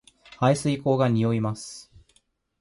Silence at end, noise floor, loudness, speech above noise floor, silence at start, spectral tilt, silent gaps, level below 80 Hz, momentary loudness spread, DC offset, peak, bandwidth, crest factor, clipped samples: 0.8 s; -67 dBFS; -24 LUFS; 43 dB; 0.4 s; -6.5 dB/octave; none; -60 dBFS; 15 LU; under 0.1%; -8 dBFS; 11.5 kHz; 18 dB; under 0.1%